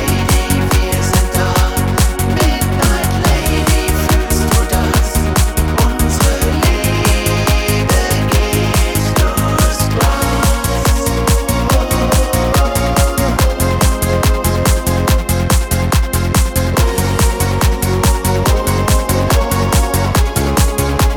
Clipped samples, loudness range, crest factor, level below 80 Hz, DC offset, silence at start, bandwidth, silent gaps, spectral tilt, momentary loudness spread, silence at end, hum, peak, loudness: under 0.1%; 1 LU; 12 dB; -16 dBFS; 0.3%; 0 s; 19.5 kHz; none; -4.5 dB/octave; 1 LU; 0 s; none; 0 dBFS; -14 LUFS